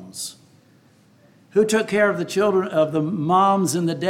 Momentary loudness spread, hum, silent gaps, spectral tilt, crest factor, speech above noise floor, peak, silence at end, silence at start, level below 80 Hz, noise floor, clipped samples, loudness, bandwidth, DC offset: 9 LU; none; none; -5 dB/octave; 16 dB; 35 dB; -6 dBFS; 0 s; 0 s; -68 dBFS; -55 dBFS; under 0.1%; -20 LUFS; 16.5 kHz; under 0.1%